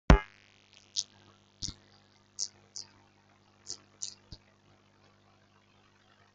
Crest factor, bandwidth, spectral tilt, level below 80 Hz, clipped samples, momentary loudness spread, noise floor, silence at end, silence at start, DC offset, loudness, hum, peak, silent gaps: 32 dB; 9.2 kHz; -4.5 dB/octave; -38 dBFS; under 0.1%; 21 LU; -65 dBFS; 2.25 s; 0.1 s; under 0.1%; -35 LUFS; 50 Hz at -65 dBFS; -2 dBFS; none